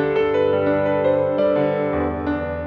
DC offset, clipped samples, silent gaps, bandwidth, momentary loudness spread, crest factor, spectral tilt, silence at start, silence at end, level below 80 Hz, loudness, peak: under 0.1%; under 0.1%; none; 5.2 kHz; 4 LU; 12 dB; -9 dB/octave; 0 s; 0 s; -42 dBFS; -20 LUFS; -8 dBFS